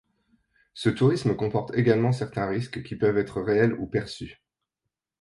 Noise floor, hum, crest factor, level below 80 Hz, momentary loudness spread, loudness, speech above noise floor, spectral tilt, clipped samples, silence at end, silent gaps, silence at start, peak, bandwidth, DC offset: -85 dBFS; none; 18 dB; -56 dBFS; 10 LU; -25 LUFS; 61 dB; -7.5 dB/octave; under 0.1%; 0.9 s; none; 0.75 s; -8 dBFS; 11.5 kHz; under 0.1%